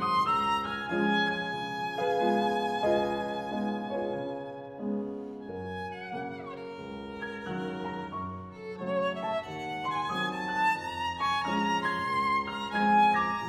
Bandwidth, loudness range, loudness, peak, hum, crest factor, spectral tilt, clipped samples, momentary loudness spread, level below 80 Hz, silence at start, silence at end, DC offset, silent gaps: 15.5 kHz; 9 LU; -30 LUFS; -14 dBFS; none; 16 dB; -5.5 dB/octave; under 0.1%; 13 LU; -64 dBFS; 0 s; 0 s; under 0.1%; none